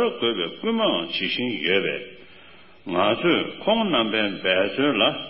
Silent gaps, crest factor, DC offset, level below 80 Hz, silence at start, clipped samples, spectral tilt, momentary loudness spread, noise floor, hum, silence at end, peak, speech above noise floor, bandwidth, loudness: none; 18 dB; 0.3%; -60 dBFS; 0 s; under 0.1%; -9.5 dB/octave; 7 LU; -49 dBFS; none; 0 s; -6 dBFS; 27 dB; 5.8 kHz; -22 LUFS